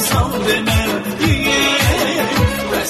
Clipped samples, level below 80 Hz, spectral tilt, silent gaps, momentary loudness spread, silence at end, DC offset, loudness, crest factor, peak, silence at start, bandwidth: under 0.1%; -28 dBFS; -4 dB/octave; none; 4 LU; 0 s; under 0.1%; -15 LUFS; 14 dB; -2 dBFS; 0 s; 13.5 kHz